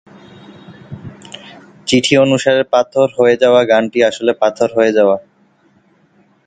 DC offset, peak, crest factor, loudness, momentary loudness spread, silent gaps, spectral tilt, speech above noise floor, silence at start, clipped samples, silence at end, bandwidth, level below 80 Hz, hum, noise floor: under 0.1%; 0 dBFS; 14 dB; -13 LUFS; 22 LU; none; -4.5 dB/octave; 41 dB; 0.7 s; under 0.1%; 1.25 s; 9.4 kHz; -56 dBFS; none; -53 dBFS